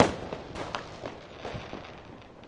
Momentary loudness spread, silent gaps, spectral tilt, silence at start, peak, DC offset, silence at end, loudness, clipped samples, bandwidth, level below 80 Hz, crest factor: 9 LU; none; -5 dB/octave; 0 s; -4 dBFS; under 0.1%; 0 s; -36 LUFS; under 0.1%; 11.5 kHz; -54 dBFS; 30 dB